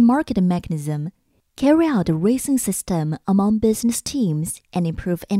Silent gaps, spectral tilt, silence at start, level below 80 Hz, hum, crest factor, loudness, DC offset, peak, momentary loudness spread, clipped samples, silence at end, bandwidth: none; -6 dB/octave; 0 s; -46 dBFS; none; 16 dB; -20 LUFS; under 0.1%; -4 dBFS; 9 LU; under 0.1%; 0 s; 16 kHz